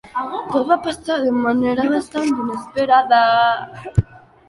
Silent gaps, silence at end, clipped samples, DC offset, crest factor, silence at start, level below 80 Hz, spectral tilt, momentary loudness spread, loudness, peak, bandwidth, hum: none; 0.3 s; under 0.1%; under 0.1%; 16 dB; 0.05 s; -42 dBFS; -6.5 dB/octave; 11 LU; -18 LUFS; -2 dBFS; 11.5 kHz; none